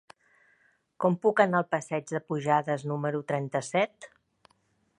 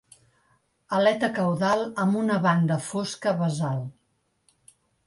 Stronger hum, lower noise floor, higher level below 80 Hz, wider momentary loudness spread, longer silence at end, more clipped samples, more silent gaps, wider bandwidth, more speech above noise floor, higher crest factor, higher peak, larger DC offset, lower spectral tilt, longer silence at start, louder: neither; about the same, -70 dBFS vs -72 dBFS; second, -76 dBFS vs -66 dBFS; about the same, 8 LU vs 7 LU; second, 0.95 s vs 1.15 s; neither; neither; about the same, 11 kHz vs 11.5 kHz; second, 43 dB vs 48 dB; first, 24 dB vs 18 dB; first, -6 dBFS vs -10 dBFS; neither; about the same, -6 dB/octave vs -6 dB/octave; about the same, 1 s vs 0.9 s; second, -28 LUFS vs -25 LUFS